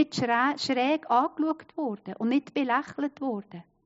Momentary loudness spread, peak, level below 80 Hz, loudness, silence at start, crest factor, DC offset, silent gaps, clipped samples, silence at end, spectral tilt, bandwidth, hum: 9 LU; -10 dBFS; -74 dBFS; -28 LUFS; 0 s; 18 dB; under 0.1%; none; under 0.1%; 0.25 s; -3 dB/octave; 7.6 kHz; none